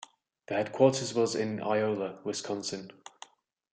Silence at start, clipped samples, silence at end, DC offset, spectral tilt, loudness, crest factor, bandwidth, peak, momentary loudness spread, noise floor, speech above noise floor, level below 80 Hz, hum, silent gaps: 0 s; under 0.1%; 0.8 s; under 0.1%; -4.5 dB/octave; -30 LUFS; 22 dB; 9.4 kHz; -10 dBFS; 18 LU; -55 dBFS; 25 dB; -74 dBFS; none; none